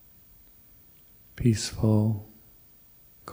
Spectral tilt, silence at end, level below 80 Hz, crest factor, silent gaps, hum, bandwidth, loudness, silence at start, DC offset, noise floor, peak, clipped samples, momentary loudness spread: -6.5 dB/octave; 0 s; -50 dBFS; 20 dB; none; none; 16 kHz; -26 LUFS; 1.35 s; under 0.1%; -55 dBFS; -10 dBFS; under 0.1%; 25 LU